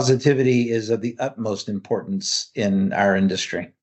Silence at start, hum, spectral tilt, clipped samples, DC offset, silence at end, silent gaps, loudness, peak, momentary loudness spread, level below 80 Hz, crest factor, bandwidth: 0 s; none; -5 dB/octave; under 0.1%; under 0.1%; 0.15 s; none; -21 LUFS; -4 dBFS; 9 LU; -66 dBFS; 18 dB; 8.4 kHz